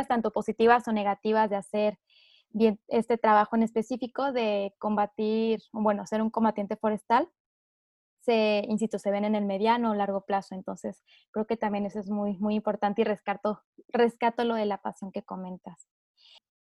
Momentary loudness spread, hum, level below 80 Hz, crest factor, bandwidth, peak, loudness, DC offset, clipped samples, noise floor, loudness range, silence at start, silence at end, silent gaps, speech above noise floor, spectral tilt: 13 LU; none; -68 dBFS; 20 dB; 11.5 kHz; -8 dBFS; -28 LUFS; under 0.1%; under 0.1%; under -90 dBFS; 4 LU; 0 s; 1 s; 7.40-8.17 s, 11.28-11.33 s, 13.64-13.73 s; over 63 dB; -6.5 dB/octave